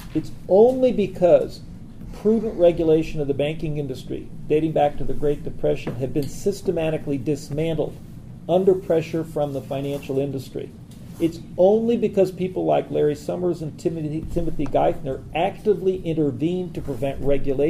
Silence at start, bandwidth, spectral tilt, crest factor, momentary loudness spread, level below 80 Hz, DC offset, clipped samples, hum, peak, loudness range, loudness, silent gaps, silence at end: 0 s; 15 kHz; -7.5 dB/octave; 18 dB; 12 LU; -38 dBFS; under 0.1%; under 0.1%; none; -4 dBFS; 4 LU; -22 LUFS; none; 0 s